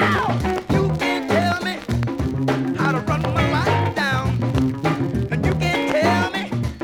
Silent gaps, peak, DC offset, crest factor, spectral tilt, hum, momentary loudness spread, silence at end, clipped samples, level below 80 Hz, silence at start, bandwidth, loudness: none; -6 dBFS; under 0.1%; 14 dB; -6.5 dB/octave; none; 5 LU; 0 s; under 0.1%; -38 dBFS; 0 s; 17 kHz; -21 LUFS